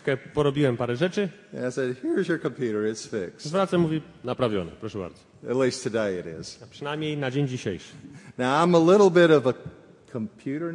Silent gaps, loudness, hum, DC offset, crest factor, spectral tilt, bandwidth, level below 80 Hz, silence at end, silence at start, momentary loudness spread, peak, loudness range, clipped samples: none; -25 LUFS; none; under 0.1%; 20 dB; -6 dB/octave; 11 kHz; -60 dBFS; 0 s; 0.05 s; 19 LU; -6 dBFS; 7 LU; under 0.1%